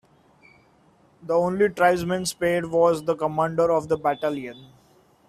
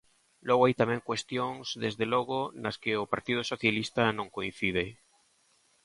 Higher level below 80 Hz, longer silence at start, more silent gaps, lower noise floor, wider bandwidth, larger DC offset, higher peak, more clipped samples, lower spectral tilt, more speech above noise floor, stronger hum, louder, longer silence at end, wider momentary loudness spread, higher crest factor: about the same, -58 dBFS vs -62 dBFS; first, 1.25 s vs 0.45 s; neither; second, -58 dBFS vs -68 dBFS; first, 14 kHz vs 11.5 kHz; neither; first, -4 dBFS vs -10 dBFS; neither; about the same, -5.5 dB/octave vs -5 dB/octave; about the same, 36 dB vs 38 dB; neither; first, -23 LUFS vs -30 LUFS; second, 0.65 s vs 0.9 s; about the same, 8 LU vs 9 LU; about the same, 20 dB vs 22 dB